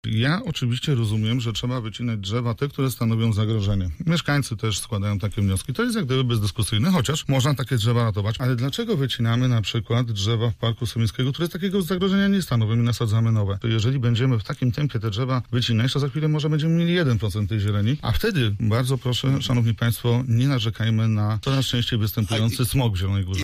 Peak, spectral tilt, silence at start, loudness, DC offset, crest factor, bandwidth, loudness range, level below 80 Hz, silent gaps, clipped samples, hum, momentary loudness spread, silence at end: -10 dBFS; -6 dB/octave; 0.05 s; -23 LUFS; under 0.1%; 12 dB; 15.5 kHz; 2 LU; -42 dBFS; none; under 0.1%; none; 4 LU; 0 s